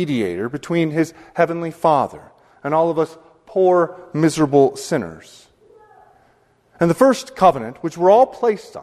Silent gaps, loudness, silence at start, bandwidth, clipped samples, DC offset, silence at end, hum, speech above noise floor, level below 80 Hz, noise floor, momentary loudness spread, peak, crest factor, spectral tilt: none; -18 LUFS; 0 s; 13.5 kHz; under 0.1%; under 0.1%; 0 s; none; 40 dB; -56 dBFS; -57 dBFS; 11 LU; 0 dBFS; 18 dB; -6.5 dB/octave